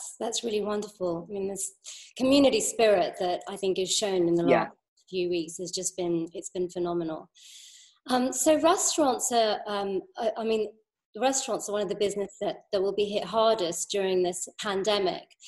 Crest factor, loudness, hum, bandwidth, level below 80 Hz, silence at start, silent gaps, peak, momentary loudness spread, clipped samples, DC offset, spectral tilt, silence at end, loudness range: 20 dB; -27 LUFS; none; 13 kHz; -64 dBFS; 0 s; 4.88-4.97 s, 11.05-11.13 s; -8 dBFS; 11 LU; under 0.1%; under 0.1%; -3 dB/octave; 0 s; 5 LU